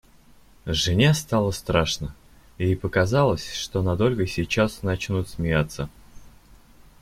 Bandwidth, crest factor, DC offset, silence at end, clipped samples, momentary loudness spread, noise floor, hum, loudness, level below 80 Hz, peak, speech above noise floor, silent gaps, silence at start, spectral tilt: 16 kHz; 20 dB; under 0.1%; 0.75 s; under 0.1%; 10 LU; -52 dBFS; none; -23 LUFS; -44 dBFS; -4 dBFS; 29 dB; none; 0.65 s; -5.5 dB/octave